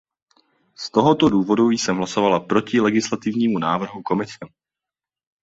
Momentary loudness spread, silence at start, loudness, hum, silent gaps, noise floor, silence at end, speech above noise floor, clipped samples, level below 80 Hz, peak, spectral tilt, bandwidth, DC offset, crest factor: 8 LU; 0.8 s; -20 LUFS; none; none; -89 dBFS; 0.95 s; 70 dB; under 0.1%; -58 dBFS; -2 dBFS; -5.5 dB/octave; 8 kHz; under 0.1%; 18 dB